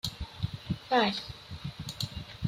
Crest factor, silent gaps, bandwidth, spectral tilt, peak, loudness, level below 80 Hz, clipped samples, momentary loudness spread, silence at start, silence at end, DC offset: 20 dB; none; 16 kHz; -5 dB/octave; -14 dBFS; -33 LUFS; -50 dBFS; under 0.1%; 15 LU; 0.05 s; 0 s; under 0.1%